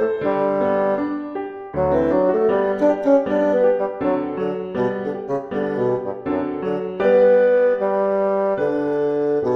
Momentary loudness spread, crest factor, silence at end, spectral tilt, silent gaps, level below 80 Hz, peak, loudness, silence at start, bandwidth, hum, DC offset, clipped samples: 9 LU; 14 dB; 0 s; -8.5 dB/octave; none; -50 dBFS; -6 dBFS; -20 LUFS; 0 s; 6.4 kHz; none; under 0.1%; under 0.1%